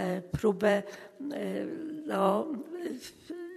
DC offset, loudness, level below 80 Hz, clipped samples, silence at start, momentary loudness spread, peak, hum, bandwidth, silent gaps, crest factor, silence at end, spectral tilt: under 0.1%; -32 LUFS; -60 dBFS; under 0.1%; 0 s; 15 LU; -12 dBFS; none; 13.5 kHz; none; 20 dB; 0 s; -6.5 dB/octave